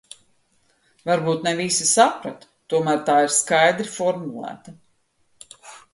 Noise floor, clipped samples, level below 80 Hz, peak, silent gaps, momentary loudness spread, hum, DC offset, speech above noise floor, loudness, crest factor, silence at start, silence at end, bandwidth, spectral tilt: -64 dBFS; under 0.1%; -68 dBFS; -2 dBFS; none; 18 LU; none; under 0.1%; 44 dB; -19 LUFS; 20 dB; 1.05 s; 0.15 s; 11.5 kHz; -3 dB/octave